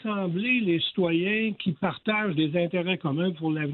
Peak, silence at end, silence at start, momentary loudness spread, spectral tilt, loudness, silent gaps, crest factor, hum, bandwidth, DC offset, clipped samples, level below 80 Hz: -12 dBFS; 0 s; 0 s; 5 LU; -10 dB/octave; -26 LUFS; none; 14 dB; none; 4.4 kHz; under 0.1%; under 0.1%; -68 dBFS